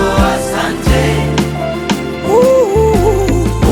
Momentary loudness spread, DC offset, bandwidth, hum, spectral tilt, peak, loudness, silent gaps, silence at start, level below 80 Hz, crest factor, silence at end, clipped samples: 7 LU; under 0.1%; 19 kHz; none; -6 dB/octave; 0 dBFS; -12 LUFS; none; 0 s; -20 dBFS; 12 dB; 0 s; under 0.1%